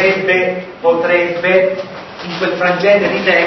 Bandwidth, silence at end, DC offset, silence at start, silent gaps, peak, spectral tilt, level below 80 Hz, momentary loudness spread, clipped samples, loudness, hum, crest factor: 6.2 kHz; 0 s; under 0.1%; 0 s; none; 0 dBFS; -5.5 dB/octave; -52 dBFS; 12 LU; under 0.1%; -13 LUFS; none; 14 dB